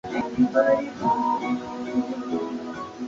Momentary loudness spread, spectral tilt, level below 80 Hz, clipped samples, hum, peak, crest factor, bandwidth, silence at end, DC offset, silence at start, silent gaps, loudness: 10 LU; -6.5 dB/octave; -58 dBFS; under 0.1%; none; -8 dBFS; 18 dB; 7.6 kHz; 0 s; under 0.1%; 0.05 s; none; -25 LUFS